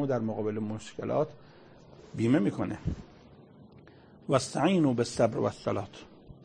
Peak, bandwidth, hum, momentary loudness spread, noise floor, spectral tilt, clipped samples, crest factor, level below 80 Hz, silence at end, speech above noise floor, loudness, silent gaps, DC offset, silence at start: -10 dBFS; 9.8 kHz; none; 14 LU; -54 dBFS; -6.5 dB/octave; under 0.1%; 22 dB; -54 dBFS; 0.15 s; 25 dB; -30 LUFS; none; under 0.1%; 0 s